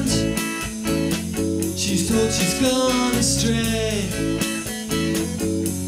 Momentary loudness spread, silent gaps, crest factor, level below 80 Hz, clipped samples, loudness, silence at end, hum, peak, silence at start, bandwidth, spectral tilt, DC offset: 5 LU; none; 16 dB; -38 dBFS; under 0.1%; -21 LUFS; 0 s; none; -6 dBFS; 0 s; 16 kHz; -4 dB/octave; under 0.1%